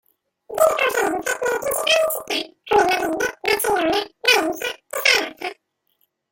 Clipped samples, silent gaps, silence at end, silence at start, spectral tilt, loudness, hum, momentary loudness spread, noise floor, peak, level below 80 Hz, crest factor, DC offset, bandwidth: under 0.1%; none; 0.8 s; 0.5 s; -1 dB/octave; -20 LUFS; none; 10 LU; -68 dBFS; -2 dBFS; -56 dBFS; 20 dB; under 0.1%; 17 kHz